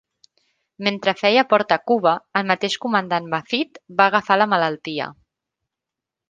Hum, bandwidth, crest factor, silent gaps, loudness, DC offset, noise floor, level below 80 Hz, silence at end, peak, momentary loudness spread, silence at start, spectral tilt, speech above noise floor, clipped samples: none; 9.6 kHz; 20 dB; none; -19 LUFS; under 0.1%; -86 dBFS; -68 dBFS; 1.2 s; -2 dBFS; 8 LU; 0.8 s; -4.5 dB/octave; 66 dB; under 0.1%